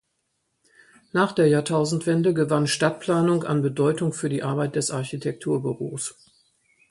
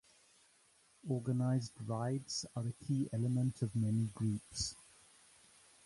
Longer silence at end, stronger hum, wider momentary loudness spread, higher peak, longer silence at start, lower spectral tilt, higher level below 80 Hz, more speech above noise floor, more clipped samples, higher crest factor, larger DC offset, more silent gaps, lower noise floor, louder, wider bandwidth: second, 0.8 s vs 1.05 s; neither; about the same, 9 LU vs 7 LU; first, -6 dBFS vs -22 dBFS; about the same, 1.15 s vs 1.05 s; about the same, -5.5 dB/octave vs -6 dB/octave; about the same, -64 dBFS vs -64 dBFS; first, 52 dB vs 33 dB; neither; about the same, 18 dB vs 16 dB; neither; neither; first, -74 dBFS vs -70 dBFS; first, -23 LUFS vs -38 LUFS; about the same, 11.5 kHz vs 11.5 kHz